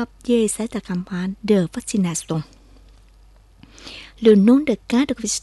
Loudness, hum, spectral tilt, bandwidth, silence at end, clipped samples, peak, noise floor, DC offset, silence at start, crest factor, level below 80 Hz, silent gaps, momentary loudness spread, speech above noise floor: -19 LUFS; none; -5.5 dB/octave; 12 kHz; 0.05 s; under 0.1%; -4 dBFS; -49 dBFS; under 0.1%; 0 s; 18 dB; -48 dBFS; none; 23 LU; 31 dB